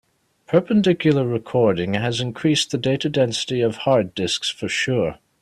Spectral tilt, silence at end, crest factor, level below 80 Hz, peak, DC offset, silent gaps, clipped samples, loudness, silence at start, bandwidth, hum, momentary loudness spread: -5 dB/octave; 0.25 s; 18 dB; -56 dBFS; -4 dBFS; under 0.1%; none; under 0.1%; -20 LUFS; 0.5 s; 13.5 kHz; none; 5 LU